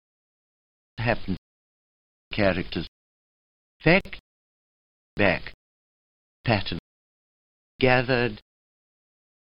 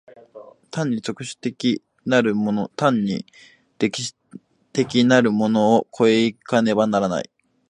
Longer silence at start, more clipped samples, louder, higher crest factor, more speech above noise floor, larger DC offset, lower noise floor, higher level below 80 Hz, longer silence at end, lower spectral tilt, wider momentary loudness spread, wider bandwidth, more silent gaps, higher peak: first, 1 s vs 0.35 s; neither; second, -25 LUFS vs -21 LUFS; about the same, 24 dB vs 20 dB; first, over 67 dB vs 26 dB; neither; first, under -90 dBFS vs -45 dBFS; first, -46 dBFS vs -62 dBFS; first, 1.05 s vs 0.45 s; first, -8.5 dB/octave vs -5.5 dB/octave; first, 21 LU vs 12 LU; second, 5.8 kHz vs 10.5 kHz; first, 1.38-2.31 s, 2.88-3.80 s, 4.20-5.17 s, 5.54-6.44 s, 6.79-7.79 s vs none; about the same, -4 dBFS vs -2 dBFS